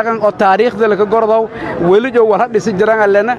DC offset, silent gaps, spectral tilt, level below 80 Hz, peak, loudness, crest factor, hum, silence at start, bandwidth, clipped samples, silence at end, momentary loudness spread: under 0.1%; none; -6.5 dB/octave; -48 dBFS; 0 dBFS; -12 LUFS; 12 dB; none; 0 s; 9.2 kHz; under 0.1%; 0 s; 4 LU